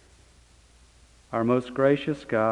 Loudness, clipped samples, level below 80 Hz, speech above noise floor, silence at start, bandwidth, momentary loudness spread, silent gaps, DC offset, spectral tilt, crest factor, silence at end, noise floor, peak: -25 LUFS; under 0.1%; -58 dBFS; 32 dB; 1.3 s; 11 kHz; 5 LU; none; under 0.1%; -7.5 dB/octave; 18 dB; 0 s; -56 dBFS; -8 dBFS